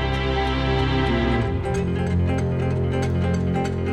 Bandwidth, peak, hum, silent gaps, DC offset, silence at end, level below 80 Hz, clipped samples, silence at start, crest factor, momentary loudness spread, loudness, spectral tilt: 9.4 kHz; -10 dBFS; none; none; under 0.1%; 0 s; -30 dBFS; under 0.1%; 0 s; 12 dB; 3 LU; -22 LUFS; -7 dB/octave